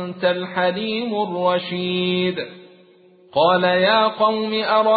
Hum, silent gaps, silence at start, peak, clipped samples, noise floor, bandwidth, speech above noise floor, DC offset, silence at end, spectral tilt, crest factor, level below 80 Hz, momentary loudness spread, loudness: none; none; 0 s; -4 dBFS; under 0.1%; -51 dBFS; 4.8 kHz; 32 dB; under 0.1%; 0 s; -10 dB/octave; 16 dB; -62 dBFS; 8 LU; -19 LUFS